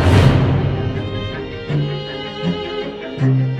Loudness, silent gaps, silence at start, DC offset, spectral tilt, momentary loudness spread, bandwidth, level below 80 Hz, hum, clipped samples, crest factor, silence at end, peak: -19 LUFS; none; 0 s; under 0.1%; -7.5 dB/octave; 13 LU; 11 kHz; -32 dBFS; none; under 0.1%; 16 dB; 0 s; 0 dBFS